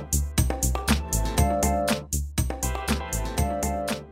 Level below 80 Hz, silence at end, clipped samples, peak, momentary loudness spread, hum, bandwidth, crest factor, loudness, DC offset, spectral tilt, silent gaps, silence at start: -30 dBFS; 0 s; under 0.1%; -8 dBFS; 5 LU; none; 16 kHz; 18 dB; -26 LUFS; under 0.1%; -4.5 dB/octave; none; 0 s